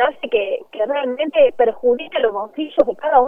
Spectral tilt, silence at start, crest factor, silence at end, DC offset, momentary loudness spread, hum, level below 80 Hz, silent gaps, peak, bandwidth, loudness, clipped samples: -5.5 dB/octave; 0 s; 18 dB; 0 s; under 0.1%; 7 LU; none; -56 dBFS; none; 0 dBFS; 4 kHz; -18 LUFS; under 0.1%